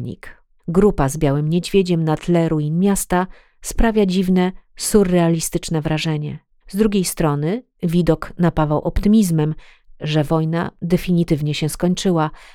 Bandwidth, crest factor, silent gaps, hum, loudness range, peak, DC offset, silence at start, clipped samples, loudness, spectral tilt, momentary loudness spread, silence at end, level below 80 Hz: 16.5 kHz; 18 dB; none; none; 2 LU; 0 dBFS; under 0.1%; 0 s; under 0.1%; -18 LUFS; -6 dB/octave; 9 LU; 0.1 s; -32 dBFS